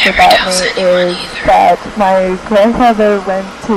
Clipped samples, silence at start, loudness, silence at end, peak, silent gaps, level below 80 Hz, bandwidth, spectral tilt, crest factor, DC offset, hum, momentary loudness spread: 0.2%; 0 s; -10 LUFS; 0 s; 0 dBFS; none; -34 dBFS; 16.5 kHz; -3.5 dB/octave; 10 dB; under 0.1%; none; 8 LU